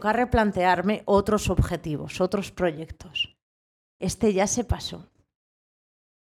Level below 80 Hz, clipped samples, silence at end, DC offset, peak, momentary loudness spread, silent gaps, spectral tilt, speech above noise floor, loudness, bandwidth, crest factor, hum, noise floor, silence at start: -40 dBFS; under 0.1%; 1.3 s; under 0.1%; -8 dBFS; 11 LU; 3.42-4.00 s; -5 dB/octave; over 66 dB; -25 LUFS; 15 kHz; 18 dB; none; under -90 dBFS; 0 s